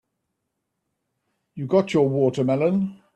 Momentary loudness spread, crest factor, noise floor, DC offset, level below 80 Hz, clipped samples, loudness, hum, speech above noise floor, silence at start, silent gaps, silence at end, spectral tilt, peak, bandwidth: 5 LU; 18 dB; -79 dBFS; under 0.1%; -64 dBFS; under 0.1%; -21 LUFS; none; 58 dB; 1.55 s; none; 0.2 s; -8 dB/octave; -6 dBFS; 9 kHz